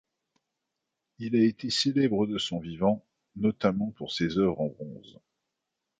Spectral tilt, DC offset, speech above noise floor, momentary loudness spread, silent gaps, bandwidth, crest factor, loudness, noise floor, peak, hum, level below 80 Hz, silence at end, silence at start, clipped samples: -5.5 dB/octave; under 0.1%; 57 dB; 10 LU; none; 9.2 kHz; 20 dB; -28 LUFS; -85 dBFS; -10 dBFS; none; -60 dBFS; 1 s; 1.2 s; under 0.1%